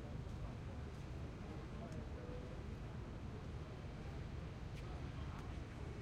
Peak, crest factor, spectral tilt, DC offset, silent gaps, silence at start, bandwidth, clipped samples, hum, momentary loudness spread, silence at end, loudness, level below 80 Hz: -36 dBFS; 12 dB; -7 dB/octave; under 0.1%; none; 0 s; 12 kHz; under 0.1%; none; 1 LU; 0 s; -50 LUFS; -54 dBFS